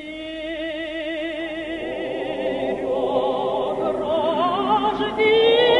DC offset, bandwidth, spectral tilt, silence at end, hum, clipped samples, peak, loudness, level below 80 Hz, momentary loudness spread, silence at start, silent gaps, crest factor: under 0.1%; 11 kHz; -5.5 dB/octave; 0 s; none; under 0.1%; -6 dBFS; -22 LUFS; -52 dBFS; 11 LU; 0 s; none; 16 dB